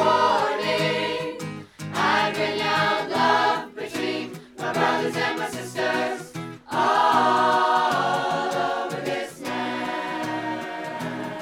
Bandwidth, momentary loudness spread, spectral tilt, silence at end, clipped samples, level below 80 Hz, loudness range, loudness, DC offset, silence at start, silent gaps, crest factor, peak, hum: 17.5 kHz; 12 LU; -4 dB/octave; 0 s; under 0.1%; -66 dBFS; 4 LU; -23 LUFS; under 0.1%; 0 s; none; 18 dB; -6 dBFS; none